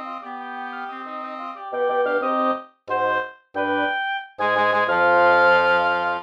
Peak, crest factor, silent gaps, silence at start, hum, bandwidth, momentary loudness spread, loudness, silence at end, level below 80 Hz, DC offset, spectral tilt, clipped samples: -6 dBFS; 16 dB; none; 0 s; none; 7.4 kHz; 16 LU; -20 LUFS; 0 s; -64 dBFS; under 0.1%; -5.5 dB/octave; under 0.1%